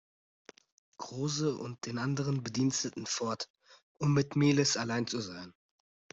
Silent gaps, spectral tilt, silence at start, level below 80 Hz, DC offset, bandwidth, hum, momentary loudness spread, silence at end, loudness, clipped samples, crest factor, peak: 3.50-3.54 s, 3.83-3.95 s; -4.5 dB/octave; 1 s; -68 dBFS; under 0.1%; 8 kHz; none; 15 LU; 0.6 s; -32 LUFS; under 0.1%; 18 dB; -16 dBFS